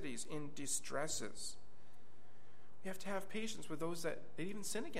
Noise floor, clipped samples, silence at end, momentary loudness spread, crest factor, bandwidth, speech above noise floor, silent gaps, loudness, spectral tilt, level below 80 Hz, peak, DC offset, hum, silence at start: -67 dBFS; under 0.1%; 0 s; 8 LU; 20 dB; 15.5 kHz; 22 dB; none; -44 LUFS; -3 dB/octave; -72 dBFS; -24 dBFS; 1%; none; 0 s